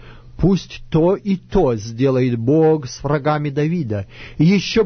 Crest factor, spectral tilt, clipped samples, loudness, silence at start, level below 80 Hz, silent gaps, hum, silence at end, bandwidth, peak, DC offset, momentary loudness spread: 14 dB; -7 dB/octave; under 0.1%; -18 LUFS; 0 s; -36 dBFS; none; none; 0 s; 6.6 kHz; -2 dBFS; under 0.1%; 7 LU